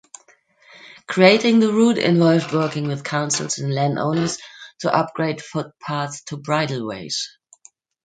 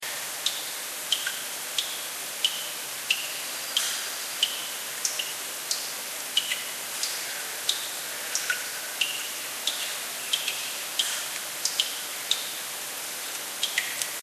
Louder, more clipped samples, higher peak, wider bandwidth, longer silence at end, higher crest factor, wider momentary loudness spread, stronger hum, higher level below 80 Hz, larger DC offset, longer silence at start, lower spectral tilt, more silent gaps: first, -20 LUFS vs -28 LUFS; neither; first, 0 dBFS vs -6 dBFS; second, 9.4 kHz vs 14.5 kHz; first, 0.75 s vs 0 s; second, 20 dB vs 26 dB; first, 13 LU vs 5 LU; neither; first, -64 dBFS vs -80 dBFS; neither; first, 0.85 s vs 0 s; first, -5 dB/octave vs 2 dB/octave; neither